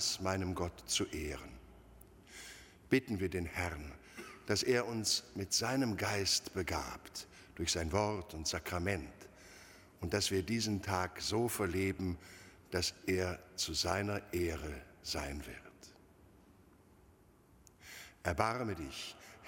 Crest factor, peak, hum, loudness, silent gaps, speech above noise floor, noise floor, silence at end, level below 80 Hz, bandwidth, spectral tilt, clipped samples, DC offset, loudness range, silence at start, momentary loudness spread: 26 dB; -14 dBFS; none; -37 LUFS; none; 28 dB; -65 dBFS; 0 s; -56 dBFS; 16.5 kHz; -3.5 dB/octave; under 0.1%; under 0.1%; 8 LU; 0 s; 19 LU